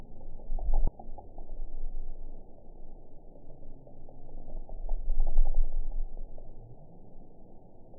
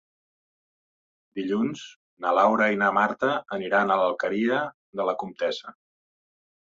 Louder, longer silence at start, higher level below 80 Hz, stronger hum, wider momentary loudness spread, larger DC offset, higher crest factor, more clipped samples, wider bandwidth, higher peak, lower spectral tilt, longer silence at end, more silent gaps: second, -40 LUFS vs -25 LUFS; second, 0 s vs 1.35 s; first, -30 dBFS vs -72 dBFS; neither; first, 21 LU vs 13 LU; first, 0.1% vs under 0.1%; about the same, 18 dB vs 20 dB; neither; second, 1 kHz vs 7.6 kHz; about the same, -10 dBFS vs -8 dBFS; first, -14.5 dB/octave vs -5.5 dB/octave; second, 0 s vs 1.05 s; second, none vs 1.96-2.17 s, 4.74-4.93 s